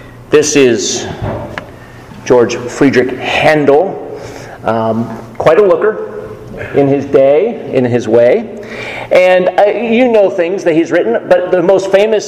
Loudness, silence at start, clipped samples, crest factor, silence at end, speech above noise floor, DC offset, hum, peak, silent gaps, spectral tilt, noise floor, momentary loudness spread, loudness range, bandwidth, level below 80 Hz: -11 LUFS; 0 s; 0.5%; 10 dB; 0 s; 22 dB; under 0.1%; none; 0 dBFS; none; -5 dB/octave; -32 dBFS; 15 LU; 2 LU; 14 kHz; -42 dBFS